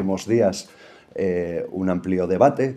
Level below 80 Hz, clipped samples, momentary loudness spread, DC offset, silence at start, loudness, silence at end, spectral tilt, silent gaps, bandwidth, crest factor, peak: -62 dBFS; under 0.1%; 14 LU; under 0.1%; 0 s; -22 LUFS; 0 s; -6.5 dB/octave; none; 12.5 kHz; 20 dB; -2 dBFS